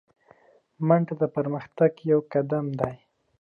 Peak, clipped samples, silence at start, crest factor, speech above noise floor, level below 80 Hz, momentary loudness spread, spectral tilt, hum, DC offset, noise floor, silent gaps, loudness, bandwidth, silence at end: -6 dBFS; under 0.1%; 0.8 s; 20 dB; 34 dB; -62 dBFS; 8 LU; -11 dB/octave; none; under 0.1%; -58 dBFS; none; -25 LUFS; 5 kHz; 0.45 s